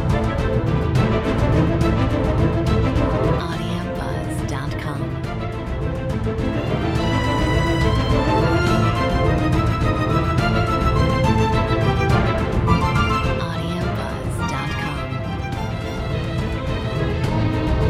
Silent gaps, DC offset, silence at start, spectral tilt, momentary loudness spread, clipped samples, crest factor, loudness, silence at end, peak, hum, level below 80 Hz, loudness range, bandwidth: none; under 0.1%; 0 s; -7 dB/octave; 8 LU; under 0.1%; 16 dB; -20 LUFS; 0 s; -4 dBFS; none; -28 dBFS; 6 LU; 14 kHz